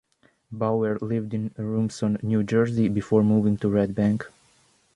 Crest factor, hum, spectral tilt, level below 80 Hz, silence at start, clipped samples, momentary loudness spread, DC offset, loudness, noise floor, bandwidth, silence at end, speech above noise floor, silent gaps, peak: 18 dB; none; -8.5 dB/octave; -54 dBFS; 0.5 s; under 0.1%; 9 LU; under 0.1%; -24 LUFS; -62 dBFS; 10.5 kHz; 0.7 s; 39 dB; none; -6 dBFS